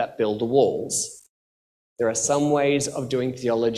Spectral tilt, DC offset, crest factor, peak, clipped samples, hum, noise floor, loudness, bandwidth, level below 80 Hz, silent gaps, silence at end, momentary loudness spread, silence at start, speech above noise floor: -4 dB/octave; under 0.1%; 18 dB; -6 dBFS; under 0.1%; none; under -90 dBFS; -23 LUFS; 14 kHz; -60 dBFS; 1.29-1.96 s; 0 s; 6 LU; 0 s; over 67 dB